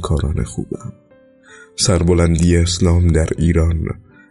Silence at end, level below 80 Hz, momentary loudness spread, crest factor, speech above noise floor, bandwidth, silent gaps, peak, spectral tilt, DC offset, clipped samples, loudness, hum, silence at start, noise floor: 0.3 s; -26 dBFS; 16 LU; 14 dB; 30 dB; 11.5 kHz; none; -4 dBFS; -5.5 dB/octave; under 0.1%; under 0.1%; -16 LUFS; none; 0 s; -45 dBFS